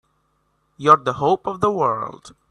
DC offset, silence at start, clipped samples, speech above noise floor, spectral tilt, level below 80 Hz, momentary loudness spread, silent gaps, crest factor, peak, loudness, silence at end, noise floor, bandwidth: under 0.1%; 0.8 s; under 0.1%; 48 dB; -6 dB/octave; -58 dBFS; 10 LU; none; 20 dB; 0 dBFS; -19 LUFS; 0.2 s; -67 dBFS; 10.5 kHz